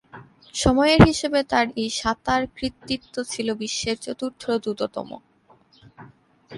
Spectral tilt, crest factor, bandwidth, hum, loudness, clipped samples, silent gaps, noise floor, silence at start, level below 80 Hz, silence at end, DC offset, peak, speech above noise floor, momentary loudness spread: -5 dB/octave; 24 dB; 11.5 kHz; none; -22 LUFS; under 0.1%; none; -57 dBFS; 0.15 s; -40 dBFS; 0 s; under 0.1%; 0 dBFS; 35 dB; 15 LU